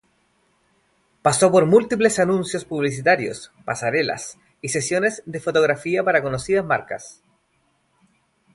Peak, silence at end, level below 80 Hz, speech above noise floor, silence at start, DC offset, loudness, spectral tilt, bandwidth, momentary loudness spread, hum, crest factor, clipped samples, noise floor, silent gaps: -2 dBFS; 1.45 s; -58 dBFS; 46 dB; 1.25 s; under 0.1%; -20 LUFS; -4.5 dB/octave; 11.5 kHz; 14 LU; none; 20 dB; under 0.1%; -66 dBFS; none